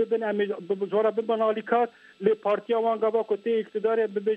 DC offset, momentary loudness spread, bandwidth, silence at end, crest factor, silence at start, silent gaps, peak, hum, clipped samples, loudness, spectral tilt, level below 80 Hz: under 0.1%; 4 LU; 4.7 kHz; 0 s; 16 dB; 0 s; none; -10 dBFS; none; under 0.1%; -26 LUFS; -7.5 dB/octave; -80 dBFS